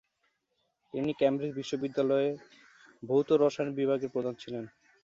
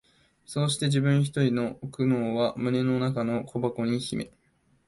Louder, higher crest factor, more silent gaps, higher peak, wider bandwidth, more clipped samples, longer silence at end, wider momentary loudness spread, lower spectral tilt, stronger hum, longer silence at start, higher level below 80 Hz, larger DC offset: second, -30 LUFS vs -27 LUFS; about the same, 18 dB vs 16 dB; neither; about the same, -14 dBFS vs -12 dBFS; second, 7.6 kHz vs 11.5 kHz; neither; second, 0.35 s vs 0.6 s; first, 15 LU vs 9 LU; about the same, -6.5 dB/octave vs -6 dB/octave; neither; first, 0.95 s vs 0.5 s; second, -74 dBFS vs -62 dBFS; neither